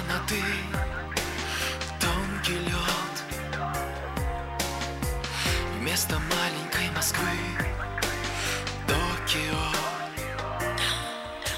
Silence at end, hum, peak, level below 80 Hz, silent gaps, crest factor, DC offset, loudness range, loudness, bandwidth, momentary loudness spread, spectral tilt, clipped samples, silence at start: 0 s; none; -12 dBFS; -38 dBFS; none; 16 dB; under 0.1%; 2 LU; -28 LUFS; 16 kHz; 6 LU; -3 dB/octave; under 0.1%; 0 s